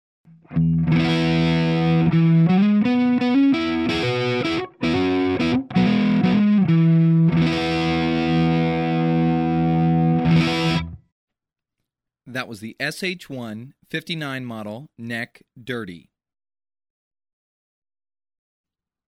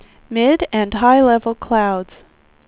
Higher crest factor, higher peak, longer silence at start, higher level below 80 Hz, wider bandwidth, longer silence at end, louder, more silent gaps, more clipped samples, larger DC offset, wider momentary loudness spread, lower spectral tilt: about the same, 12 dB vs 16 dB; second, -8 dBFS vs -2 dBFS; first, 0.5 s vs 0.3 s; about the same, -46 dBFS vs -42 dBFS; first, 10.5 kHz vs 4 kHz; first, 3.1 s vs 0.65 s; second, -19 LUFS vs -16 LUFS; first, 11.12-11.28 s vs none; neither; neither; about the same, 15 LU vs 13 LU; second, -7.5 dB/octave vs -9.5 dB/octave